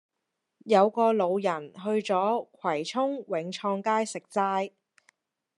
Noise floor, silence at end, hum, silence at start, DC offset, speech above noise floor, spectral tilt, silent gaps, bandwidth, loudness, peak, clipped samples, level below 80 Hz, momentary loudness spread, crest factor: -83 dBFS; 0.9 s; none; 0.65 s; under 0.1%; 56 dB; -5 dB/octave; none; 11.5 kHz; -27 LUFS; -8 dBFS; under 0.1%; -86 dBFS; 8 LU; 20 dB